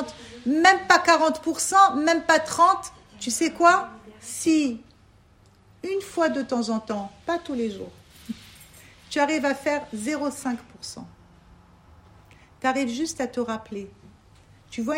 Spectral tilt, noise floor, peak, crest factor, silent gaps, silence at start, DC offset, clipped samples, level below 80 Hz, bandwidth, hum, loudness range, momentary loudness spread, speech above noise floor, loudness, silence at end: -2.5 dB/octave; -56 dBFS; -2 dBFS; 22 dB; none; 0 s; under 0.1%; under 0.1%; -60 dBFS; 16 kHz; none; 11 LU; 21 LU; 33 dB; -23 LUFS; 0 s